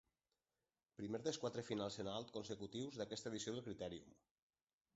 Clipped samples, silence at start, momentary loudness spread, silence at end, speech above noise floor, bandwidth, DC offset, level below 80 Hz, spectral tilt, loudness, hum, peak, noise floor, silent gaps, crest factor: under 0.1%; 1 s; 7 LU; 0.85 s; over 42 dB; 8 kHz; under 0.1%; -76 dBFS; -4.5 dB/octave; -48 LUFS; none; -28 dBFS; under -90 dBFS; none; 20 dB